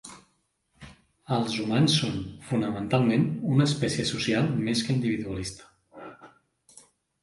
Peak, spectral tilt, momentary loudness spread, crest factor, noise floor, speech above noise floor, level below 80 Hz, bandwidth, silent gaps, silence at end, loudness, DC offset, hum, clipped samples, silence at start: -10 dBFS; -5.5 dB/octave; 22 LU; 18 dB; -72 dBFS; 46 dB; -56 dBFS; 11.5 kHz; none; 0.95 s; -26 LUFS; under 0.1%; none; under 0.1%; 0.05 s